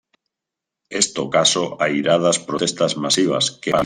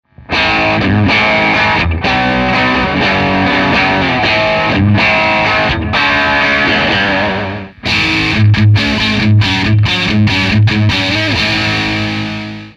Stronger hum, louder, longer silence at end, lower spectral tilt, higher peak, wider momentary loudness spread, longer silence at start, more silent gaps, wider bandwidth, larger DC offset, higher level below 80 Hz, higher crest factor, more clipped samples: neither; second, -18 LUFS vs -11 LUFS; about the same, 0 s vs 0.05 s; second, -3 dB/octave vs -5.5 dB/octave; about the same, 0 dBFS vs 0 dBFS; about the same, 4 LU vs 4 LU; first, 0.9 s vs 0.2 s; neither; first, 15 kHz vs 8.4 kHz; neither; second, -58 dBFS vs -30 dBFS; first, 20 dB vs 12 dB; neither